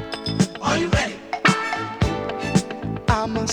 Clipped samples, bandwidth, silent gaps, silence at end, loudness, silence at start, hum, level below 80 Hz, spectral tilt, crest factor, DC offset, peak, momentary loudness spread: under 0.1%; 17.5 kHz; none; 0 s; -22 LUFS; 0 s; none; -36 dBFS; -5 dB/octave; 18 dB; under 0.1%; -4 dBFS; 7 LU